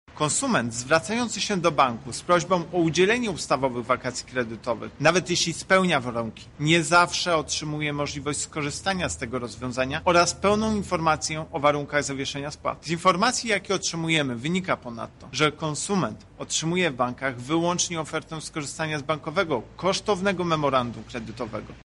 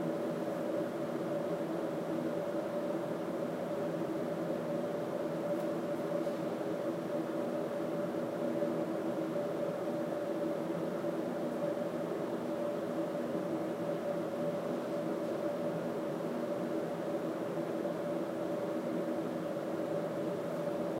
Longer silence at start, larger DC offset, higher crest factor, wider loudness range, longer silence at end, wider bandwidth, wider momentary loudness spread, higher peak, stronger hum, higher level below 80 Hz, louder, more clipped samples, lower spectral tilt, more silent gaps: about the same, 0.1 s vs 0 s; neither; first, 20 dB vs 14 dB; first, 4 LU vs 1 LU; about the same, 0.05 s vs 0 s; second, 11.5 kHz vs 16 kHz; first, 11 LU vs 1 LU; first, -6 dBFS vs -22 dBFS; neither; first, -52 dBFS vs -80 dBFS; first, -25 LUFS vs -37 LUFS; neither; second, -4 dB/octave vs -7 dB/octave; neither